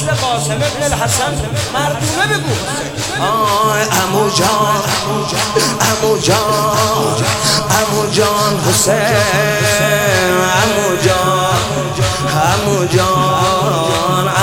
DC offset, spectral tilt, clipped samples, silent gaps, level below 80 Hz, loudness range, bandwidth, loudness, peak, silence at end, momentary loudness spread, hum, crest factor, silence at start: under 0.1%; -3.5 dB/octave; under 0.1%; none; -36 dBFS; 3 LU; 18 kHz; -13 LUFS; 0 dBFS; 0 s; 4 LU; none; 14 dB; 0 s